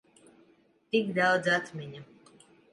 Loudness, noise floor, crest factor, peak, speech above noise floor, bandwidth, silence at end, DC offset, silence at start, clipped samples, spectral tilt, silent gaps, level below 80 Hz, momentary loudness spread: -27 LUFS; -65 dBFS; 20 dB; -12 dBFS; 36 dB; 11.5 kHz; 0.7 s; under 0.1%; 0.95 s; under 0.1%; -5 dB/octave; none; -76 dBFS; 19 LU